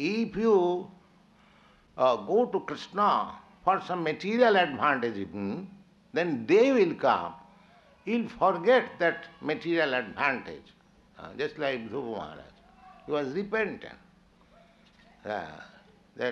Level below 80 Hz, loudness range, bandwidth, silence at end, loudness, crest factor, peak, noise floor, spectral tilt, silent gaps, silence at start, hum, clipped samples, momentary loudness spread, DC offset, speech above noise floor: -66 dBFS; 10 LU; 7.8 kHz; 0 s; -28 LUFS; 20 dB; -10 dBFS; -60 dBFS; -6 dB/octave; none; 0 s; none; under 0.1%; 20 LU; under 0.1%; 33 dB